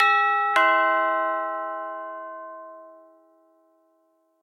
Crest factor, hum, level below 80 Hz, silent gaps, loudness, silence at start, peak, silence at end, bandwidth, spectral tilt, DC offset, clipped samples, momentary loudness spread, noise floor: 20 dB; none; -88 dBFS; none; -22 LUFS; 0 s; -6 dBFS; 1.5 s; 13 kHz; -1 dB/octave; under 0.1%; under 0.1%; 21 LU; -67 dBFS